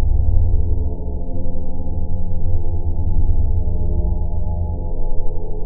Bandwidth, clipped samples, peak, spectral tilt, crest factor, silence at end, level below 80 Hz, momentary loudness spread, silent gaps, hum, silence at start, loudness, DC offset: 1 kHz; under 0.1%; 0 dBFS; -9.5 dB/octave; 14 dB; 0 s; -18 dBFS; 8 LU; none; none; 0 s; -24 LUFS; under 0.1%